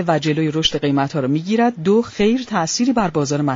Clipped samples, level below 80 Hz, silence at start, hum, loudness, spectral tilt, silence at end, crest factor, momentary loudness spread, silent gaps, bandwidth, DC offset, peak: under 0.1%; -48 dBFS; 0 s; none; -18 LUFS; -4.5 dB/octave; 0 s; 14 dB; 3 LU; none; 7.6 kHz; under 0.1%; -2 dBFS